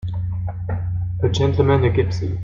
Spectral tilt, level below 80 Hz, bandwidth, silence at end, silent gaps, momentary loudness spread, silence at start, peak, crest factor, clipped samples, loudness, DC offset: -7.5 dB/octave; -36 dBFS; 7.4 kHz; 0 s; none; 10 LU; 0 s; -4 dBFS; 16 dB; under 0.1%; -20 LUFS; under 0.1%